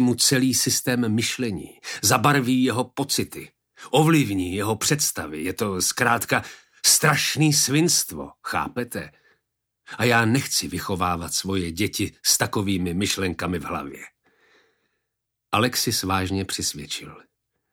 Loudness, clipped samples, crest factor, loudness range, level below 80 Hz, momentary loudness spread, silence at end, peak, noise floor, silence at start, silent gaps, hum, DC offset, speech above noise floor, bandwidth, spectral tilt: -22 LUFS; under 0.1%; 20 dB; 6 LU; -54 dBFS; 13 LU; 0.55 s; -4 dBFS; -81 dBFS; 0 s; none; none; under 0.1%; 58 dB; 19.5 kHz; -3.5 dB/octave